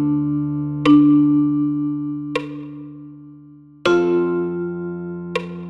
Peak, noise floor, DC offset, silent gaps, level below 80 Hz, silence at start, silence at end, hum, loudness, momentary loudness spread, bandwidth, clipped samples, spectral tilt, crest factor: -4 dBFS; -44 dBFS; under 0.1%; none; -54 dBFS; 0 s; 0 s; none; -19 LUFS; 20 LU; 7.2 kHz; under 0.1%; -8 dB/octave; 16 dB